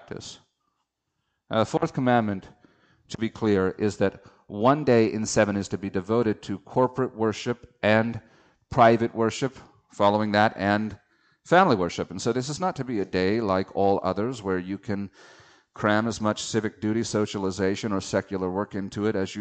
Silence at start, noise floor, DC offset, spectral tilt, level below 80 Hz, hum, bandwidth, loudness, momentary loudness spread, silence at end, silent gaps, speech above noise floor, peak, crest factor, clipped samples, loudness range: 0.1 s; -79 dBFS; under 0.1%; -5.5 dB/octave; -58 dBFS; none; 9 kHz; -25 LUFS; 11 LU; 0 s; none; 54 dB; -6 dBFS; 20 dB; under 0.1%; 4 LU